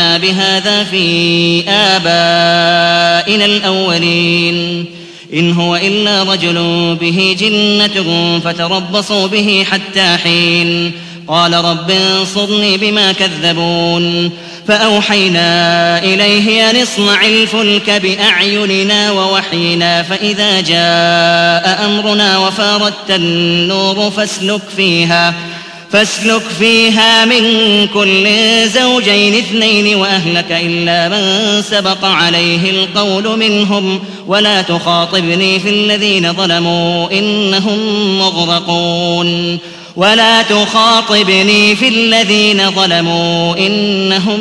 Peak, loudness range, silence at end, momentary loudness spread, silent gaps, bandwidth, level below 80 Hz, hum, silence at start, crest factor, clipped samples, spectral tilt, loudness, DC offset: 0 dBFS; 3 LU; 0 s; 6 LU; none; 11 kHz; -52 dBFS; none; 0 s; 10 dB; 0.3%; -4 dB/octave; -9 LUFS; under 0.1%